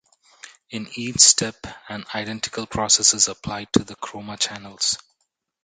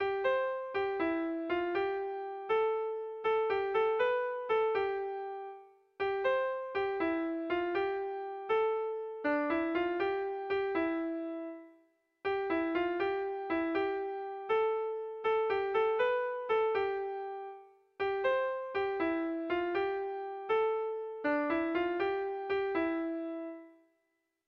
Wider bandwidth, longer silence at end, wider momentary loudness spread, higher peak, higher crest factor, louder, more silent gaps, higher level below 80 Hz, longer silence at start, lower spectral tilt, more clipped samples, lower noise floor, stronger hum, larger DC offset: first, 10 kHz vs 6 kHz; about the same, 0.65 s vs 0.75 s; first, 20 LU vs 8 LU; first, 0 dBFS vs -20 dBFS; first, 24 dB vs 14 dB; first, -19 LUFS vs -33 LUFS; neither; first, -52 dBFS vs -68 dBFS; first, 0.45 s vs 0 s; second, -1.5 dB/octave vs -6.5 dB/octave; neither; second, -74 dBFS vs -81 dBFS; neither; neither